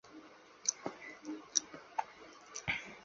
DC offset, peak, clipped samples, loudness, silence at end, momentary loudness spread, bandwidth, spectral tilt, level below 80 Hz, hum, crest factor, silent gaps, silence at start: under 0.1%; -10 dBFS; under 0.1%; -39 LUFS; 0 s; 20 LU; 7.6 kHz; -1 dB/octave; -70 dBFS; none; 32 dB; none; 0.05 s